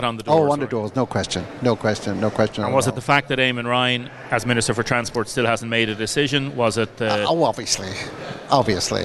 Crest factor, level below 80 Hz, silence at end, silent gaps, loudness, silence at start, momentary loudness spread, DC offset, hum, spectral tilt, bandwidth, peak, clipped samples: 20 dB; -48 dBFS; 0 s; none; -21 LUFS; 0 s; 6 LU; under 0.1%; none; -4 dB/octave; 12 kHz; -2 dBFS; under 0.1%